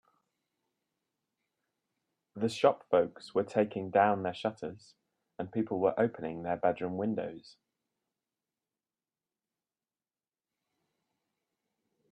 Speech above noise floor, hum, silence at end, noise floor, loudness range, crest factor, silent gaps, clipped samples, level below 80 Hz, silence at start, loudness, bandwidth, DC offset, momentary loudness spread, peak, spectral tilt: over 59 dB; none; 4.75 s; under -90 dBFS; 7 LU; 24 dB; none; under 0.1%; -76 dBFS; 2.35 s; -31 LUFS; 11 kHz; under 0.1%; 15 LU; -12 dBFS; -6.5 dB/octave